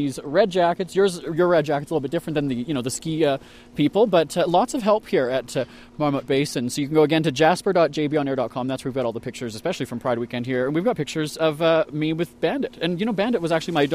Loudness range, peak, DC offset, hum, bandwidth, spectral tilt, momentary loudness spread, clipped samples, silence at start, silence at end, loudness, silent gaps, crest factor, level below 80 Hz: 3 LU; -4 dBFS; under 0.1%; none; 15.5 kHz; -5.5 dB/octave; 8 LU; under 0.1%; 0 s; 0 s; -22 LUFS; none; 18 dB; -56 dBFS